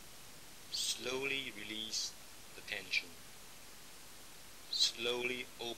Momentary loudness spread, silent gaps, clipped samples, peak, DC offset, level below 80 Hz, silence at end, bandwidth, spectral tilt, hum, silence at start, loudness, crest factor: 21 LU; none; under 0.1%; -18 dBFS; 0.2%; -70 dBFS; 0 s; 18 kHz; -0.5 dB/octave; none; 0 s; -37 LUFS; 24 dB